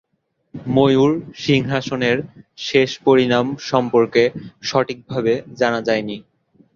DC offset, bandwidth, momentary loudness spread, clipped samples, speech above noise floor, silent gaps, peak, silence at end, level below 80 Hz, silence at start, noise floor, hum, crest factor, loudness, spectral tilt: under 0.1%; 7.4 kHz; 13 LU; under 0.1%; 51 dB; none; -2 dBFS; 0.55 s; -54 dBFS; 0.55 s; -69 dBFS; none; 18 dB; -18 LUFS; -6 dB/octave